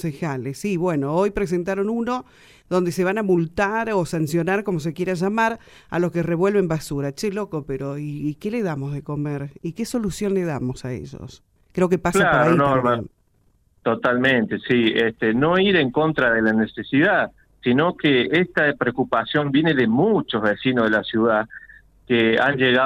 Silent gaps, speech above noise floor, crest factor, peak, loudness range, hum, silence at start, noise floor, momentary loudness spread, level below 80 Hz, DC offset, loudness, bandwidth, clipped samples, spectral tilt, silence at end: none; 41 dB; 18 dB; -4 dBFS; 7 LU; none; 0 s; -61 dBFS; 11 LU; -50 dBFS; under 0.1%; -21 LUFS; 15.5 kHz; under 0.1%; -6 dB/octave; 0 s